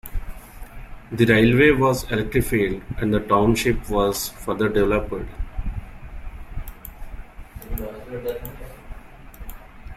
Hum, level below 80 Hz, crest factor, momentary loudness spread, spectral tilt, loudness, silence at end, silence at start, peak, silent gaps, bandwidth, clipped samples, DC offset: none; -34 dBFS; 20 dB; 26 LU; -5.5 dB/octave; -21 LUFS; 0 s; 0.05 s; -2 dBFS; none; 16.5 kHz; under 0.1%; under 0.1%